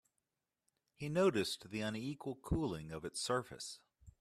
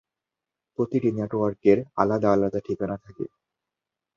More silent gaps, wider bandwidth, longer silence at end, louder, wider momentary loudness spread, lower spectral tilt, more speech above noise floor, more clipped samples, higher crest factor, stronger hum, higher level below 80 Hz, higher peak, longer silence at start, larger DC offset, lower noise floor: neither; first, 14 kHz vs 7 kHz; second, 0.1 s vs 0.9 s; second, -39 LUFS vs -24 LUFS; about the same, 14 LU vs 16 LU; second, -5 dB/octave vs -9 dB/octave; second, 50 dB vs 64 dB; neither; about the same, 18 dB vs 22 dB; neither; about the same, -58 dBFS vs -58 dBFS; second, -22 dBFS vs -4 dBFS; first, 1 s vs 0.8 s; neither; about the same, -88 dBFS vs -88 dBFS